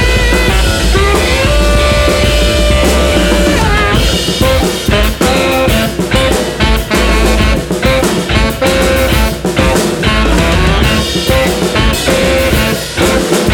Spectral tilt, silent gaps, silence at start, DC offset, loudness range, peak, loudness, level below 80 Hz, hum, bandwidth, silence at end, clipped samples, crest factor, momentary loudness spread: -4.5 dB/octave; none; 0 s; under 0.1%; 1 LU; 0 dBFS; -10 LUFS; -14 dBFS; none; 19 kHz; 0 s; under 0.1%; 10 dB; 2 LU